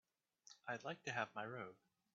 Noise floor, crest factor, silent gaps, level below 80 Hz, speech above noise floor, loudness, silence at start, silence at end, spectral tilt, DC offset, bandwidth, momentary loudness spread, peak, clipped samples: -69 dBFS; 24 dB; none; under -90 dBFS; 21 dB; -48 LUFS; 0.45 s; 0.4 s; -2.5 dB/octave; under 0.1%; 7.4 kHz; 12 LU; -26 dBFS; under 0.1%